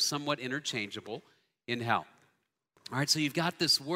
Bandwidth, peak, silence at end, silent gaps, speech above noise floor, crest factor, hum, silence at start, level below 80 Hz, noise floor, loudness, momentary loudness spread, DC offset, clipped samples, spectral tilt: 16 kHz; -12 dBFS; 0 s; none; 44 dB; 22 dB; none; 0 s; -76 dBFS; -76 dBFS; -31 LUFS; 17 LU; under 0.1%; under 0.1%; -3 dB/octave